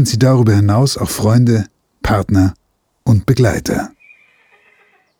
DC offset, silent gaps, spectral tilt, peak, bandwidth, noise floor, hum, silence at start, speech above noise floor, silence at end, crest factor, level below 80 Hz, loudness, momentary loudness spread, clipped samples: under 0.1%; none; -6.5 dB/octave; 0 dBFS; 18 kHz; -54 dBFS; none; 0 s; 42 dB; 1.3 s; 14 dB; -36 dBFS; -14 LUFS; 11 LU; under 0.1%